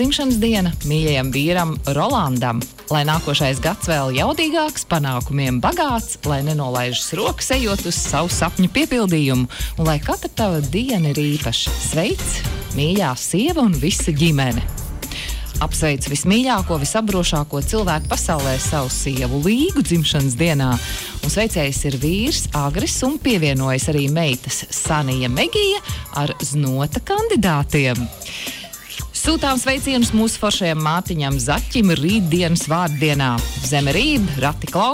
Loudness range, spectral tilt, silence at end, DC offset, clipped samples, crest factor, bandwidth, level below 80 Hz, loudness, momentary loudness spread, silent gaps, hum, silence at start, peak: 2 LU; -4.5 dB/octave; 0 s; under 0.1%; under 0.1%; 12 dB; 16 kHz; -30 dBFS; -19 LUFS; 5 LU; none; none; 0 s; -6 dBFS